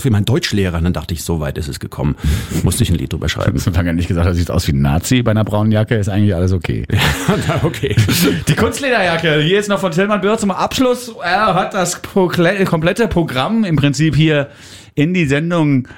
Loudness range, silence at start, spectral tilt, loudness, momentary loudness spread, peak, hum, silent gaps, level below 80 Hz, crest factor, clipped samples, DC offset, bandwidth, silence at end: 3 LU; 0 s; -5.5 dB/octave; -15 LUFS; 5 LU; -2 dBFS; none; none; -30 dBFS; 14 dB; under 0.1%; under 0.1%; 17 kHz; 0 s